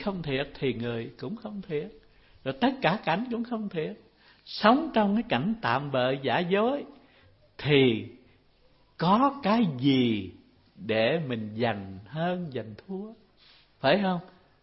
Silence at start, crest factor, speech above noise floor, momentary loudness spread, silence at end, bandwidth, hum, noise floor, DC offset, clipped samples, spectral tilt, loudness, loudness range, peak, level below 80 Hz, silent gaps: 0 s; 24 dB; 35 dB; 15 LU; 0.35 s; 5.8 kHz; none; -62 dBFS; under 0.1%; under 0.1%; -10 dB/octave; -27 LUFS; 5 LU; -6 dBFS; -60 dBFS; none